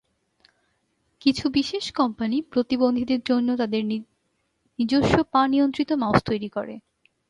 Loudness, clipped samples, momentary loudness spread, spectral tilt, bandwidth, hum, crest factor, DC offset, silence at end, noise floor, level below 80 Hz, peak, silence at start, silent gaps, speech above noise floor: -23 LUFS; under 0.1%; 10 LU; -6 dB/octave; 11 kHz; none; 24 dB; under 0.1%; 0.5 s; -72 dBFS; -50 dBFS; 0 dBFS; 1.25 s; none; 50 dB